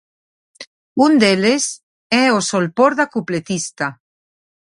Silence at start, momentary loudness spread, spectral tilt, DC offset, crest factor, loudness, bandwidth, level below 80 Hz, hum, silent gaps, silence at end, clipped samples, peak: 0.6 s; 12 LU; -4 dB/octave; under 0.1%; 18 dB; -16 LUFS; 11.5 kHz; -62 dBFS; none; 0.67-0.96 s, 1.83-2.10 s; 0.75 s; under 0.1%; 0 dBFS